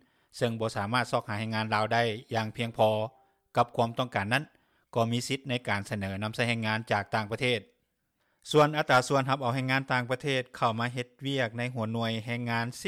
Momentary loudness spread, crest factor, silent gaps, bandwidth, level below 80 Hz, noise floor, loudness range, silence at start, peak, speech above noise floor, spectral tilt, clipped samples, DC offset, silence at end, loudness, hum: 8 LU; 20 dB; none; 15 kHz; -68 dBFS; -77 dBFS; 3 LU; 0.35 s; -10 dBFS; 47 dB; -5 dB/octave; under 0.1%; under 0.1%; 0 s; -29 LUFS; none